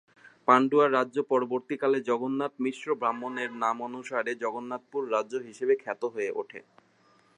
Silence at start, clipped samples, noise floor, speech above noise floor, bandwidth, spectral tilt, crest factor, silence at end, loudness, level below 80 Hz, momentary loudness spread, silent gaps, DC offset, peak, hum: 0.45 s; under 0.1%; -63 dBFS; 35 dB; 10 kHz; -5.5 dB/octave; 24 dB; 0.75 s; -28 LUFS; -84 dBFS; 12 LU; none; under 0.1%; -6 dBFS; none